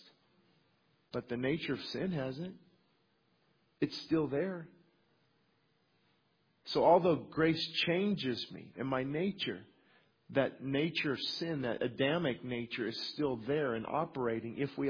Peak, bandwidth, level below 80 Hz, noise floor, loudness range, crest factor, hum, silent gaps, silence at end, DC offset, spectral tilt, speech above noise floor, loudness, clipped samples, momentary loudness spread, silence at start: -14 dBFS; 5.4 kHz; -70 dBFS; -75 dBFS; 8 LU; 22 dB; none; none; 0 s; under 0.1%; -4 dB/octave; 40 dB; -35 LUFS; under 0.1%; 9 LU; 1.15 s